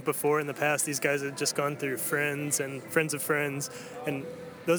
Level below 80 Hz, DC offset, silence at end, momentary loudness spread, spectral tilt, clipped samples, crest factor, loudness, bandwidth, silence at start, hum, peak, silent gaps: -76 dBFS; under 0.1%; 0 s; 9 LU; -3.5 dB/octave; under 0.1%; 18 dB; -29 LUFS; over 20 kHz; 0 s; none; -10 dBFS; none